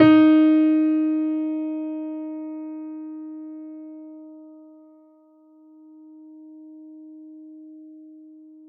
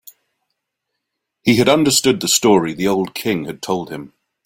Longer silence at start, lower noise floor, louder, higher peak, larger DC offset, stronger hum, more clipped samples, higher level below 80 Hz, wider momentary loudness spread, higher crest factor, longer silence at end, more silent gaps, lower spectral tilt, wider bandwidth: second, 0 s vs 1.45 s; second, -54 dBFS vs -77 dBFS; second, -21 LUFS vs -16 LUFS; about the same, -4 dBFS vs -2 dBFS; neither; neither; neither; second, -68 dBFS vs -54 dBFS; first, 28 LU vs 10 LU; about the same, 20 dB vs 16 dB; first, 0.7 s vs 0.4 s; neither; first, -5.5 dB/octave vs -3.5 dB/octave; second, 4.8 kHz vs 17 kHz